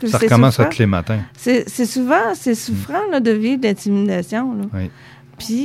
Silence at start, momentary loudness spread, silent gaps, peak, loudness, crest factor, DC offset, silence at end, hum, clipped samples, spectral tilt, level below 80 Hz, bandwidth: 0 s; 11 LU; none; 0 dBFS; -17 LUFS; 16 dB; under 0.1%; 0 s; none; under 0.1%; -6 dB/octave; -48 dBFS; 15.5 kHz